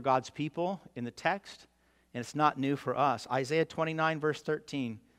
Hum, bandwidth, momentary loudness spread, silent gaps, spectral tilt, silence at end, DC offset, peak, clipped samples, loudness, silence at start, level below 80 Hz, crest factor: none; 14.5 kHz; 10 LU; none; -5.5 dB/octave; 0.2 s; under 0.1%; -12 dBFS; under 0.1%; -32 LUFS; 0 s; -72 dBFS; 20 dB